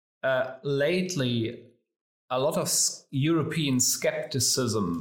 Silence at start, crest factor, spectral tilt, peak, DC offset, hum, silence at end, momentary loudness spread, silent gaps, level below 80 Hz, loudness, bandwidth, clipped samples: 0.25 s; 14 dB; -3.5 dB/octave; -12 dBFS; under 0.1%; none; 0 s; 6 LU; 2.01-2.28 s; -64 dBFS; -26 LUFS; 17 kHz; under 0.1%